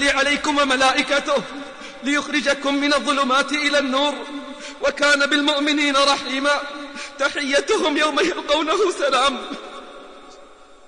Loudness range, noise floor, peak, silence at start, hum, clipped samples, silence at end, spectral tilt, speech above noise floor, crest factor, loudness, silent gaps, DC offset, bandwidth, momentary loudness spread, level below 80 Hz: 2 LU; -46 dBFS; -6 dBFS; 0 s; none; under 0.1%; 0.45 s; -1.5 dB/octave; 26 dB; 16 dB; -19 LUFS; none; 0.3%; 10 kHz; 16 LU; -52 dBFS